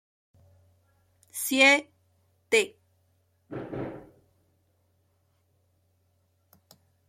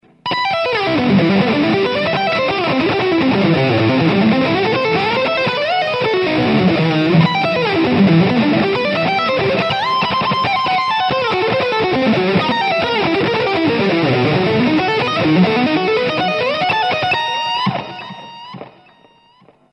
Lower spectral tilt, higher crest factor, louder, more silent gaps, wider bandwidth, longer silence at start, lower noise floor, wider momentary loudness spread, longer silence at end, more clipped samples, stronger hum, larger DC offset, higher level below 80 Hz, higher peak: second, -2 dB/octave vs -7 dB/octave; first, 26 dB vs 14 dB; second, -24 LUFS vs -15 LUFS; neither; first, 16.5 kHz vs 8.8 kHz; first, 1.35 s vs 0.25 s; first, -70 dBFS vs -50 dBFS; first, 22 LU vs 3 LU; first, 3.1 s vs 1.05 s; neither; neither; neither; second, -70 dBFS vs -50 dBFS; second, -6 dBFS vs 0 dBFS